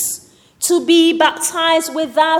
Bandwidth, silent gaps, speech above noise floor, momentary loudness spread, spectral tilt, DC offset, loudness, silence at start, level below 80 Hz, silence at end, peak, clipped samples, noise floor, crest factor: 17 kHz; none; 22 dB; 10 LU; -1 dB/octave; under 0.1%; -14 LUFS; 0 s; -64 dBFS; 0 s; -2 dBFS; under 0.1%; -36 dBFS; 14 dB